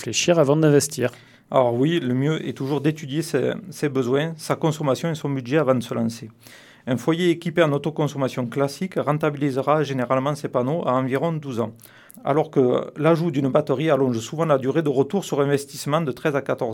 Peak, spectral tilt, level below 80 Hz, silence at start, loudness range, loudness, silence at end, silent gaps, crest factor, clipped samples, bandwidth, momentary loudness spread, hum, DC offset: -4 dBFS; -6 dB/octave; -68 dBFS; 0 s; 3 LU; -22 LUFS; 0 s; none; 18 dB; under 0.1%; 17.5 kHz; 7 LU; none; under 0.1%